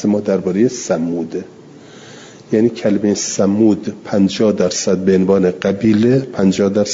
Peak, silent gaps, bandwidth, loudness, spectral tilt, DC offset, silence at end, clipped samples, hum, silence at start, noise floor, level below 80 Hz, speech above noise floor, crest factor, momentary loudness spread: -2 dBFS; none; 7.8 kHz; -15 LUFS; -5.5 dB/octave; under 0.1%; 0 s; under 0.1%; none; 0 s; -38 dBFS; -54 dBFS; 24 dB; 12 dB; 7 LU